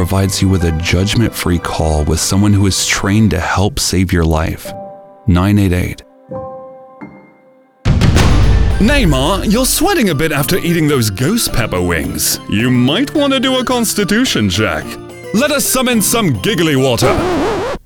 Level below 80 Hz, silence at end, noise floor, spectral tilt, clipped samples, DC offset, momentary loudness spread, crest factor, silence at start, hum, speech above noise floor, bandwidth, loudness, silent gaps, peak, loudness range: -24 dBFS; 0.1 s; -47 dBFS; -4.5 dB/octave; under 0.1%; under 0.1%; 10 LU; 14 dB; 0 s; none; 34 dB; over 20 kHz; -13 LUFS; none; 0 dBFS; 4 LU